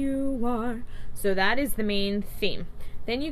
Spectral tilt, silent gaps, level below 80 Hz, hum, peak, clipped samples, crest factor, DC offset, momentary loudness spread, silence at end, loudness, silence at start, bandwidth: -4.5 dB/octave; none; -38 dBFS; none; -10 dBFS; under 0.1%; 16 dB; under 0.1%; 14 LU; 0 s; -28 LUFS; 0 s; 14 kHz